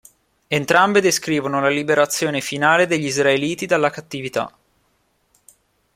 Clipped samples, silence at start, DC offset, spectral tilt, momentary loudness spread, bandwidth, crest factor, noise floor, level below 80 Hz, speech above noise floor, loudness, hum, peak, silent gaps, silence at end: under 0.1%; 0.5 s; under 0.1%; -3.5 dB/octave; 10 LU; 16.5 kHz; 18 dB; -65 dBFS; -60 dBFS; 46 dB; -18 LUFS; none; -2 dBFS; none; 1.45 s